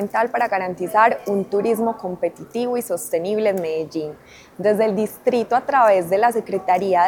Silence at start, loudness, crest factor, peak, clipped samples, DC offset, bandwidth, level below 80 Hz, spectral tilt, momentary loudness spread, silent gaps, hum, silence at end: 0 s; -20 LUFS; 18 dB; -2 dBFS; under 0.1%; under 0.1%; 19.5 kHz; -64 dBFS; -5.5 dB/octave; 9 LU; none; none; 0 s